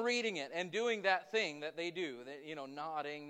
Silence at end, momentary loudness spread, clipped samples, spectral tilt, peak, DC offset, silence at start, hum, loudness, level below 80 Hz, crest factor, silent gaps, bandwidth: 0 s; 12 LU; under 0.1%; -3 dB/octave; -18 dBFS; under 0.1%; 0 s; none; -38 LUFS; under -90 dBFS; 20 dB; none; 9.8 kHz